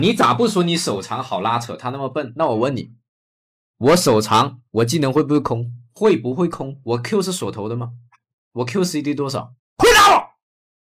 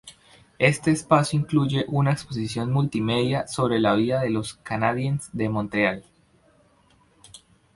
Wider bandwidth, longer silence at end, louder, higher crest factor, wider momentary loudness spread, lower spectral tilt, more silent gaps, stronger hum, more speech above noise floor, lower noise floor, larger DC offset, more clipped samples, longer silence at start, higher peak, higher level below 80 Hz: first, 16 kHz vs 11.5 kHz; first, 0.75 s vs 0.4 s; first, -18 LUFS vs -23 LUFS; second, 14 dB vs 22 dB; first, 14 LU vs 7 LU; second, -4.5 dB/octave vs -6 dB/octave; first, 3.08-3.74 s, 8.33-8.51 s, 9.59-9.77 s vs none; neither; first, over 71 dB vs 37 dB; first, under -90 dBFS vs -60 dBFS; neither; neither; about the same, 0 s vs 0.05 s; about the same, -4 dBFS vs -4 dBFS; first, -46 dBFS vs -54 dBFS